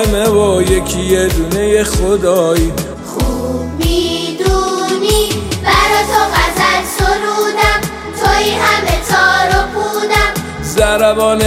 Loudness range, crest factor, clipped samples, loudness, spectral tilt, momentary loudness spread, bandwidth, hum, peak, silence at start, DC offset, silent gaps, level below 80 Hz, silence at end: 2 LU; 12 dB; under 0.1%; -13 LUFS; -4 dB/octave; 6 LU; 16.5 kHz; none; 0 dBFS; 0 s; under 0.1%; none; -22 dBFS; 0 s